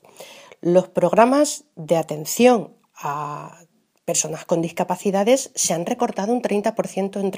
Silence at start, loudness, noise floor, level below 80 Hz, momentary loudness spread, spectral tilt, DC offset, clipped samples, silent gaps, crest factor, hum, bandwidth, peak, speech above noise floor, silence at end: 0.2 s; -20 LUFS; -43 dBFS; -70 dBFS; 15 LU; -4.5 dB/octave; under 0.1%; under 0.1%; none; 20 dB; none; 15.5 kHz; 0 dBFS; 23 dB; 0 s